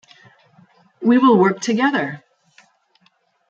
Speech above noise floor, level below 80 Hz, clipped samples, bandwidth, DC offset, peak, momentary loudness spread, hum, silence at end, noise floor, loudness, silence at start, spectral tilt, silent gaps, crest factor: 46 dB; -72 dBFS; under 0.1%; 8 kHz; under 0.1%; -2 dBFS; 13 LU; none; 1.35 s; -61 dBFS; -17 LUFS; 1 s; -5.5 dB/octave; none; 18 dB